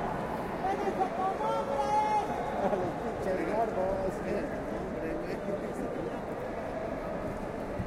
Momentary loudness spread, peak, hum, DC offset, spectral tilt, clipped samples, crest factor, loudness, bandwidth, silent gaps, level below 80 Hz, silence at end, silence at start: 7 LU; -14 dBFS; none; under 0.1%; -6.5 dB/octave; under 0.1%; 18 dB; -33 LUFS; 16 kHz; none; -50 dBFS; 0 s; 0 s